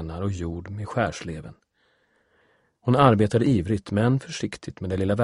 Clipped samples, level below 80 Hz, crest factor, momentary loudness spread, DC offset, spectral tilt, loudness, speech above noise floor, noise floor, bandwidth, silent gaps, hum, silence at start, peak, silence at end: under 0.1%; -48 dBFS; 22 dB; 16 LU; under 0.1%; -7 dB/octave; -24 LUFS; 43 dB; -67 dBFS; 11.5 kHz; none; none; 0 s; -2 dBFS; 0 s